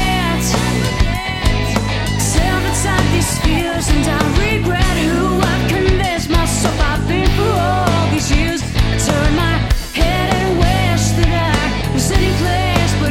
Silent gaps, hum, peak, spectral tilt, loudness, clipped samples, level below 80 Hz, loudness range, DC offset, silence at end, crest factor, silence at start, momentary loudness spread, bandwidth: none; none; -2 dBFS; -5 dB/octave; -15 LUFS; under 0.1%; -20 dBFS; 1 LU; under 0.1%; 0 s; 14 dB; 0 s; 3 LU; 16.5 kHz